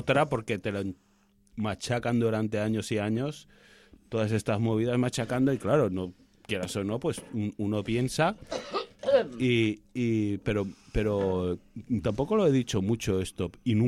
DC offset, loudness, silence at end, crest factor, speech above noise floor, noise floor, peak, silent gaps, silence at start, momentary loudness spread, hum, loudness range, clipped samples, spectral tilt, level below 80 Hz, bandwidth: under 0.1%; -29 LUFS; 0 s; 18 dB; 34 dB; -62 dBFS; -10 dBFS; none; 0 s; 9 LU; none; 2 LU; under 0.1%; -6.5 dB/octave; -50 dBFS; 15 kHz